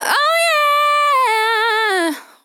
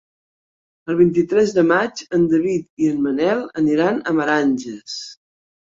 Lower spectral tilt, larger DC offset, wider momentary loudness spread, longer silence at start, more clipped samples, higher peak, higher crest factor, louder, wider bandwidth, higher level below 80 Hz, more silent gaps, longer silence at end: second, 1 dB/octave vs -6 dB/octave; neither; second, 3 LU vs 14 LU; second, 0 s vs 0.85 s; neither; about the same, -4 dBFS vs -2 dBFS; about the same, 12 dB vs 16 dB; first, -14 LUFS vs -18 LUFS; first, 19.5 kHz vs 7.6 kHz; second, -84 dBFS vs -58 dBFS; second, none vs 2.70-2.77 s; second, 0.2 s vs 0.65 s